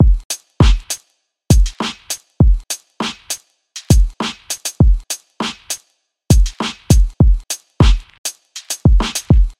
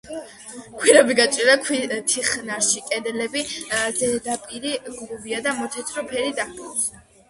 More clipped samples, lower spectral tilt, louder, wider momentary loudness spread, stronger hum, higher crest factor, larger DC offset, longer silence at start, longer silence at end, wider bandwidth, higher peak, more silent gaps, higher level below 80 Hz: neither; first, -5 dB/octave vs -1 dB/octave; first, -17 LUFS vs -21 LUFS; second, 12 LU vs 15 LU; neither; second, 14 dB vs 22 dB; neither; about the same, 0 s vs 0.05 s; second, 0.1 s vs 0.3 s; first, 15.5 kHz vs 12 kHz; about the same, 0 dBFS vs 0 dBFS; first, 0.25-0.30 s, 8.18-8.24 s vs none; first, -16 dBFS vs -60 dBFS